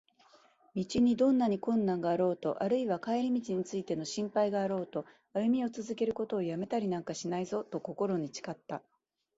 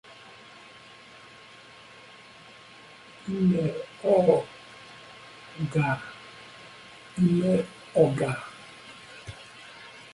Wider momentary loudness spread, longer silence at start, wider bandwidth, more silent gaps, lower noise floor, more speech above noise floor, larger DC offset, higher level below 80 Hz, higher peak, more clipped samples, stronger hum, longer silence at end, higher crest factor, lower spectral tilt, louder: second, 11 LU vs 24 LU; first, 0.75 s vs 0.1 s; second, 8 kHz vs 11.5 kHz; neither; first, -64 dBFS vs -50 dBFS; first, 32 dB vs 26 dB; neither; second, -70 dBFS vs -62 dBFS; second, -18 dBFS vs -6 dBFS; neither; neither; first, 0.6 s vs 0.1 s; second, 16 dB vs 22 dB; second, -6 dB/octave vs -7.5 dB/octave; second, -33 LUFS vs -26 LUFS